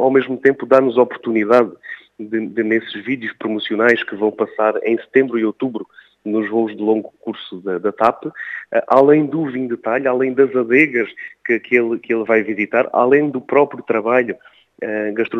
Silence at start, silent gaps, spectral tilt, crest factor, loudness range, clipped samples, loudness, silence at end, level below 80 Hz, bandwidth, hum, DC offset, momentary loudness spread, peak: 0 s; none; -7.5 dB/octave; 18 dB; 4 LU; under 0.1%; -17 LUFS; 0 s; -68 dBFS; 6.8 kHz; none; under 0.1%; 13 LU; 0 dBFS